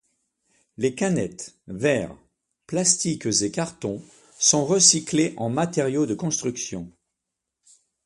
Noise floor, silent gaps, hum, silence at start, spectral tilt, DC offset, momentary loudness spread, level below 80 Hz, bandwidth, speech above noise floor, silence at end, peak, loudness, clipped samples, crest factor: -83 dBFS; none; none; 0.8 s; -3 dB/octave; under 0.1%; 17 LU; -60 dBFS; 11.5 kHz; 60 dB; 1.15 s; 0 dBFS; -22 LUFS; under 0.1%; 24 dB